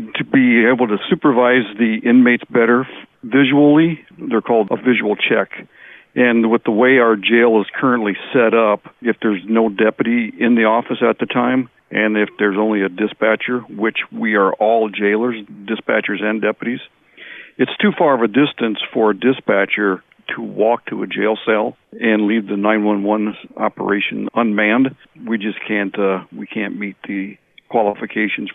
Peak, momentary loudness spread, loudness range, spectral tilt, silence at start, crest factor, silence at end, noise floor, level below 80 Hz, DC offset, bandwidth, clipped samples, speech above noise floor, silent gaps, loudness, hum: -4 dBFS; 12 LU; 5 LU; -9.5 dB/octave; 0 s; 14 dB; 0.05 s; -38 dBFS; -64 dBFS; under 0.1%; 3.9 kHz; under 0.1%; 22 dB; none; -16 LUFS; none